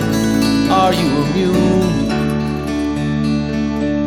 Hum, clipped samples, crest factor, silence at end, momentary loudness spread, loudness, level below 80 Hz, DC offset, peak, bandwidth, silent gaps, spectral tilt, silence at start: none; under 0.1%; 14 dB; 0 s; 6 LU; -16 LUFS; -32 dBFS; under 0.1%; -2 dBFS; 17 kHz; none; -6 dB/octave; 0 s